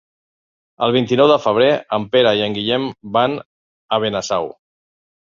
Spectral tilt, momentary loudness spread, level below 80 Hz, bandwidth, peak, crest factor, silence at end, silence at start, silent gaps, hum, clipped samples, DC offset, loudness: -5 dB/octave; 9 LU; -58 dBFS; 7.6 kHz; -2 dBFS; 16 dB; 0.75 s; 0.8 s; 3.45-3.89 s; none; under 0.1%; under 0.1%; -17 LUFS